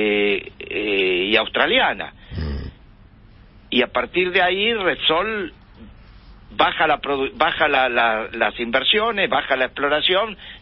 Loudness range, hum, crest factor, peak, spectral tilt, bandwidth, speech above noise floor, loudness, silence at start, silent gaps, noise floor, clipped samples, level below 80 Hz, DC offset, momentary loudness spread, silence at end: 3 LU; none; 20 dB; -2 dBFS; -9 dB/octave; 5.8 kHz; 27 dB; -19 LUFS; 0 s; none; -47 dBFS; under 0.1%; -42 dBFS; under 0.1%; 12 LU; 0 s